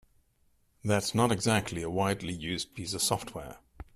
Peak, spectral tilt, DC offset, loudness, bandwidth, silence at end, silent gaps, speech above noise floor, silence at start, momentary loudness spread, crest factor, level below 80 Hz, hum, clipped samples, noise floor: -12 dBFS; -4 dB/octave; under 0.1%; -30 LUFS; 15 kHz; 0.15 s; none; 39 dB; 0.85 s; 15 LU; 20 dB; -56 dBFS; none; under 0.1%; -69 dBFS